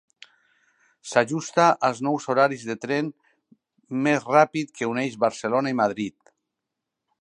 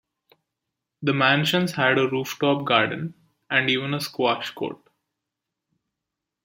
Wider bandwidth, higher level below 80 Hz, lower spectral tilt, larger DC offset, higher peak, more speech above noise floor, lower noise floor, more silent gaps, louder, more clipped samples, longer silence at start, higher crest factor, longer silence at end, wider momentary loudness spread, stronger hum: second, 11 kHz vs 16.5 kHz; second, -74 dBFS vs -68 dBFS; about the same, -5 dB/octave vs -5 dB/octave; neither; about the same, -2 dBFS vs -4 dBFS; about the same, 61 dB vs 62 dB; about the same, -84 dBFS vs -84 dBFS; neither; about the same, -23 LUFS vs -22 LUFS; neither; about the same, 1.05 s vs 1 s; about the same, 22 dB vs 22 dB; second, 1.1 s vs 1.7 s; about the same, 12 LU vs 12 LU; neither